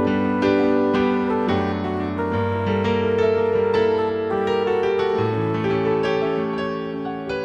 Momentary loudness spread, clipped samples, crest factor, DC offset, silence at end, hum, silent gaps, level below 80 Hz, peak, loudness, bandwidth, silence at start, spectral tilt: 6 LU; under 0.1%; 14 dB; under 0.1%; 0 s; none; none; -52 dBFS; -6 dBFS; -21 LUFS; 7.4 kHz; 0 s; -7.5 dB/octave